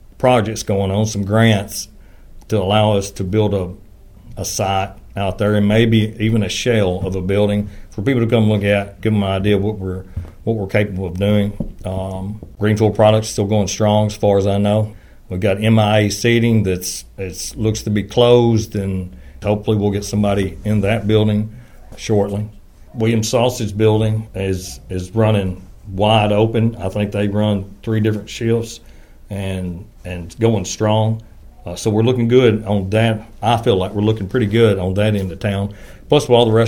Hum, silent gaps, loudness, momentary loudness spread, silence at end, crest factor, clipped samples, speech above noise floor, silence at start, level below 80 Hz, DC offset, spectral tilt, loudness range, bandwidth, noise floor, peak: none; none; -17 LUFS; 13 LU; 0 s; 16 dB; under 0.1%; 23 dB; 0.2 s; -38 dBFS; under 0.1%; -6 dB/octave; 4 LU; 18 kHz; -39 dBFS; 0 dBFS